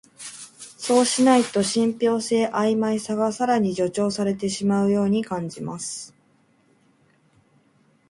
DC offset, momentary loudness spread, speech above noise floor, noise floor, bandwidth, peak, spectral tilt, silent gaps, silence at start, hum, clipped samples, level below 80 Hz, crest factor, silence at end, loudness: under 0.1%; 17 LU; 40 dB; -61 dBFS; 11.5 kHz; -4 dBFS; -4.5 dB/octave; none; 0.2 s; none; under 0.1%; -64 dBFS; 18 dB; 2 s; -22 LUFS